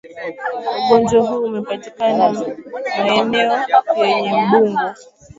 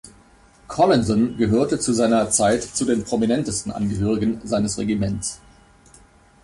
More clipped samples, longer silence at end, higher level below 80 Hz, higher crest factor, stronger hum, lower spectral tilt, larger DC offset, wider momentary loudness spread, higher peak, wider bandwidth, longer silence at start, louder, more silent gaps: neither; second, 0.35 s vs 1.05 s; second, -56 dBFS vs -44 dBFS; about the same, 16 dB vs 16 dB; neither; about the same, -5 dB/octave vs -5 dB/octave; neither; first, 12 LU vs 8 LU; first, 0 dBFS vs -6 dBFS; second, 7.8 kHz vs 11.5 kHz; about the same, 0.05 s vs 0.05 s; first, -17 LUFS vs -21 LUFS; neither